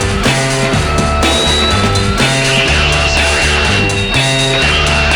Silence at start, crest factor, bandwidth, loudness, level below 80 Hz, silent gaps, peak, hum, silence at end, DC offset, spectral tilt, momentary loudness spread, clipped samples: 0 s; 10 dB; over 20 kHz; -11 LUFS; -22 dBFS; none; 0 dBFS; none; 0 s; under 0.1%; -3.5 dB/octave; 3 LU; under 0.1%